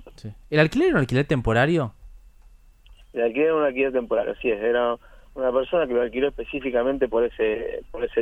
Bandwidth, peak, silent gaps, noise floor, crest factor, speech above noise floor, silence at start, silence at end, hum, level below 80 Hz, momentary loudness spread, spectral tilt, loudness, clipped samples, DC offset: 11 kHz; -4 dBFS; none; -50 dBFS; 20 dB; 28 dB; 0 s; 0 s; none; -44 dBFS; 10 LU; -7.5 dB/octave; -23 LUFS; under 0.1%; under 0.1%